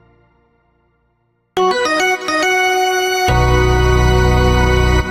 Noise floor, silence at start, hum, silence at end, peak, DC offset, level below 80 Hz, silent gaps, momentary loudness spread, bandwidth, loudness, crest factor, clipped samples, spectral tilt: -62 dBFS; 1.55 s; none; 0 s; -2 dBFS; under 0.1%; -20 dBFS; none; 2 LU; 12.5 kHz; -14 LUFS; 12 dB; under 0.1%; -5 dB/octave